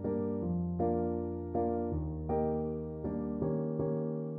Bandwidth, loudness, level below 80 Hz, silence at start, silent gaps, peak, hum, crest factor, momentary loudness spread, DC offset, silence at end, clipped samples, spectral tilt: 2.5 kHz; -35 LUFS; -50 dBFS; 0 s; none; -20 dBFS; none; 14 dB; 5 LU; under 0.1%; 0 s; under 0.1%; -14 dB/octave